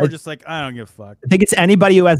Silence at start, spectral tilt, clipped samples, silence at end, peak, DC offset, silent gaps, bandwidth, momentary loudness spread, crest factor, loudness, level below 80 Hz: 0 s; -5.5 dB/octave; under 0.1%; 0 s; 0 dBFS; under 0.1%; none; 16 kHz; 20 LU; 14 dB; -14 LUFS; -50 dBFS